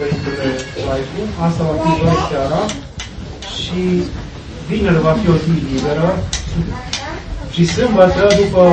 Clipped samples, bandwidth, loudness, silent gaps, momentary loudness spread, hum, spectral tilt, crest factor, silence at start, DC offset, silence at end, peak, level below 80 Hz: under 0.1%; 8.8 kHz; -16 LUFS; none; 15 LU; none; -6 dB/octave; 16 dB; 0 s; under 0.1%; 0 s; 0 dBFS; -30 dBFS